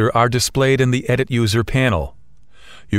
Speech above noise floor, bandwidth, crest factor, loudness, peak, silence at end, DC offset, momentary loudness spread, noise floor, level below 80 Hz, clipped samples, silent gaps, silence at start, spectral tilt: 34 dB; 16 kHz; 16 dB; -17 LUFS; -2 dBFS; 0 s; 0.6%; 3 LU; -51 dBFS; -36 dBFS; under 0.1%; none; 0 s; -5 dB/octave